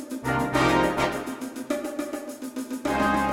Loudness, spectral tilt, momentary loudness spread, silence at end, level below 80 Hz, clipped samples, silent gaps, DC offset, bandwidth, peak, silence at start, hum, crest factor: -26 LUFS; -5 dB/octave; 13 LU; 0 s; -46 dBFS; under 0.1%; none; under 0.1%; 16.5 kHz; -8 dBFS; 0 s; none; 18 dB